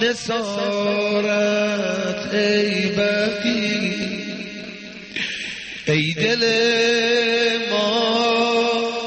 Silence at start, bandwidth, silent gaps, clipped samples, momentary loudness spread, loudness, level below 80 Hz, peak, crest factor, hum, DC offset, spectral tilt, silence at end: 0 s; 8.8 kHz; none; under 0.1%; 11 LU; -19 LUFS; -60 dBFS; -6 dBFS; 14 dB; none; under 0.1%; -4 dB/octave; 0 s